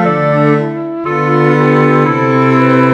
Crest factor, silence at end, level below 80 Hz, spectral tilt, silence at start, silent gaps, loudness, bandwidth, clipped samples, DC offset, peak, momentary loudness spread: 10 dB; 0 s; -50 dBFS; -8.5 dB/octave; 0 s; none; -11 LUFS; 8 kHz; 0.2%; under 0.1%; 0 dBFS; 7 LU